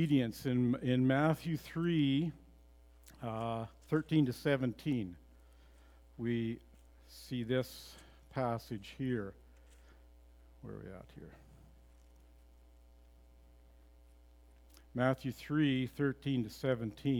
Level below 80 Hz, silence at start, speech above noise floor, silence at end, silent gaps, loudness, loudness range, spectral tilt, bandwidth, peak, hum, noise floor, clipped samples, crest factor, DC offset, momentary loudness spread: -60 dBFS; 0 s; 26 dB; 0 s; none; -36 LUFS; 21 LU; -7.5 dB/octave; 18 kHz; -16 dBFS; none; -61 dBFS; under 0.1%; 22 dB; under 0.1%; 19 LU